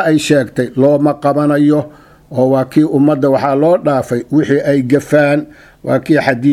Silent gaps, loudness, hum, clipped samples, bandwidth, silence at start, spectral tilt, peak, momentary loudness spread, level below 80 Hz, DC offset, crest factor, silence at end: none; -12 LUFS; none; under 0.1%; 14 kHz; 0 s; -7 dB/octave; 0 dBFS; 6 LU; -50 dBFS; under 0.1%; 12 dB; 0 s